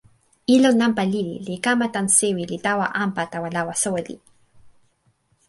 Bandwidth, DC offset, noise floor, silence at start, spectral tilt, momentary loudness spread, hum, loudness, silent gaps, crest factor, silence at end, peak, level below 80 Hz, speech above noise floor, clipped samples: 11.5 kHz; under 0.1%; -65 dBFS; 0.5 s; -3.5 dB/octave; 10 LU; none; -21 LUFS; none; 20 dB; 0.8 s; -4 dBFS; -62 dBFS; 44 dB; under 0.1%